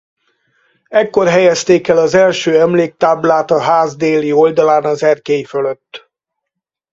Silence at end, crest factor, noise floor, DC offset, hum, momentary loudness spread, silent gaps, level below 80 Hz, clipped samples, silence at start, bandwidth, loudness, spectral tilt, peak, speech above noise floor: 0.95 s; 12 dB; -79 dBFS; under 0.1%; none; 6 LU; none; -56 dBFS; under 0.1%; 0.9 s; 7.8 kHz; -12 LUFS; -5 dB/octave; 0 dBFS; 67 dB